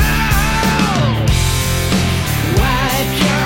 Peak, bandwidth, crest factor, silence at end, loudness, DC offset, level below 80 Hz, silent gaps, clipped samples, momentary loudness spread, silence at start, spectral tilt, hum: -2 dBFS; 17 kHz; 12 dB; 0 s; -15 LUFS; under 0.1%; -22 dBFS; none; under 0.1%; 2 LU; 0 s; -4.5 dB/octave; none